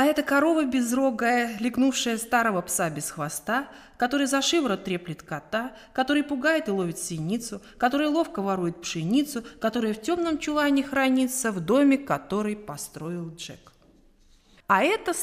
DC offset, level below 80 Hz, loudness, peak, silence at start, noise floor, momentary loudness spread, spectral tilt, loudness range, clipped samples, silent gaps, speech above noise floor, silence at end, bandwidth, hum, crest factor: under 0.1%; -58 dBFS; -25 LUFS; -6 dBFS; 0 s; -58 dBFS; 12 LU; -4 dB/octave; 3 LU; under 0.1%; none; 32 dB; 0 s; 15.5 kHz; none; 18 dB